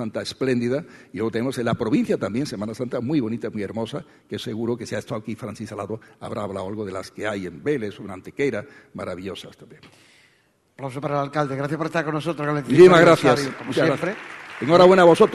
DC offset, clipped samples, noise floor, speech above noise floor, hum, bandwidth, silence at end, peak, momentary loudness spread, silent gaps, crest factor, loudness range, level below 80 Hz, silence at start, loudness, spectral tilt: under 0.1%; under 0.1%; -62 dBFS; 41 dB; none; 12.5 kHz; 0 s; -2 dBFS; 20 LU; none; 20 dB; 12 LU; -58 dBFS; 0 s; -21 LUFS; -6 dB/octave